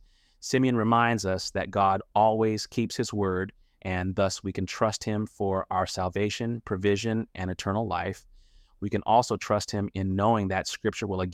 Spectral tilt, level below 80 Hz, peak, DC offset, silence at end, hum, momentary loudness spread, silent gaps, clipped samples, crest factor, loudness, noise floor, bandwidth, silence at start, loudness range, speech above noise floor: -5.5 dB/octave; -56 dBFS; -8 dBFS; under 0.1%; 0 s; none; 9 LU; none; under 0.1%; 18 dB; -27 LUFS; -56 dBFS; 15.5 kHz; 0.4 s; 4 LU; 29 dB